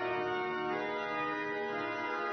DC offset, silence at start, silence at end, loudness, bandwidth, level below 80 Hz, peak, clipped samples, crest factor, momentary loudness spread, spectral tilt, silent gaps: under 0.1%; 0 s; 0 s; -35 LUFS; 6.2 kHz; -74 dBFS; -24 dBFS; under 0.1%; 12 dB; 2 LU; -2 dB/octave; none